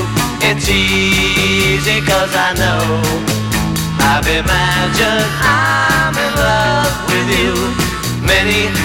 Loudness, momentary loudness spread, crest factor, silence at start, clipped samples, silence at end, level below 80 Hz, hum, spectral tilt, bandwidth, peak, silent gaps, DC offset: -13 LUFS; 5 LU; 12 dB; 0 s; under 0.1%; 0 s; -28 dBFS; none; -4 dB/octave; 19 kHz; -2 dBFS; none; 0.3%